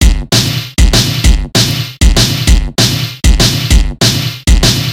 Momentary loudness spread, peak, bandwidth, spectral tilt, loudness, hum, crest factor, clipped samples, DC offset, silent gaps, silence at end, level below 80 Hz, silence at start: 3 LU; 0 dBFS; 17 kHz; -3.5 dB/octave; -10 LUFS; none; 10 dB; 0.9%; under 0.1%; none; 0 s; -12 dBFS; 0 s